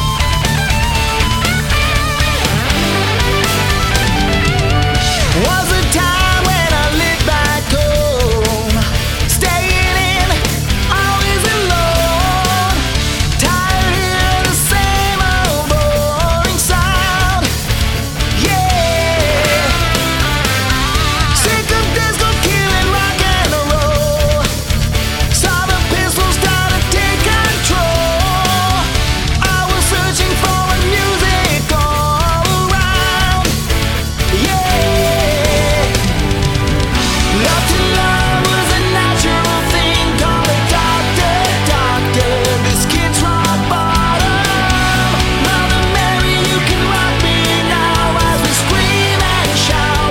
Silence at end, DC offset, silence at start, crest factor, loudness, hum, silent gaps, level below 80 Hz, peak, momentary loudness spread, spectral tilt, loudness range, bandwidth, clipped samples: 0 s; under 0.1%; 0 s; 12 dB; -13 LUFS; none; none; -20 dBFS; 0 dBFS; 2 LU; -4 dB/octave; 1 LU; 19 kHz; under 0.1%